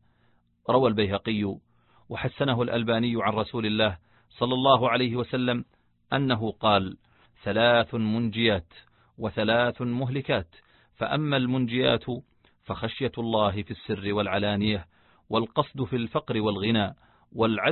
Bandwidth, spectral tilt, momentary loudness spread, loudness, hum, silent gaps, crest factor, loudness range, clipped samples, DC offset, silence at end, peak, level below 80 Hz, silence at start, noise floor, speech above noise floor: 4.4 kHz; -10.5 dB/octave; 11 LU; -26 LUFS; none; none; 22 dB; 3 LU; under 0.1%; under 0.1%; 0 s; -4 dBFS; -52 dBFS; 0.7 s; -66 dBFS; 40 dB